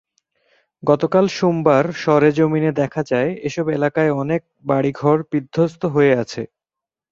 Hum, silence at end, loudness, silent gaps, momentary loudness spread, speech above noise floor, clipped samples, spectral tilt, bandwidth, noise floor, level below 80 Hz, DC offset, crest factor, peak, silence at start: none; 0.65 s; -18 LUFS; none; 8 LU; 70 dB; under 0.1%; -7 dB/octave; 7.6 kHz; -87 dBFS; -58 dBFS; under 0.1%; 16 dB; -2 dBFS; 0.85 s